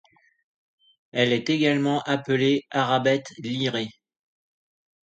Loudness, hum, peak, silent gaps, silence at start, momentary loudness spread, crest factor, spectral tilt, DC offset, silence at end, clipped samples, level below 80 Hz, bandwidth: -24 LUFS; none; -6 dBFS; none; 1.15 s; 9 LU; 20 dB; -5.5 dB/octave; under 0.1%; 1.1 s; under 0.1%; -68 dBFS; 8.8 kHz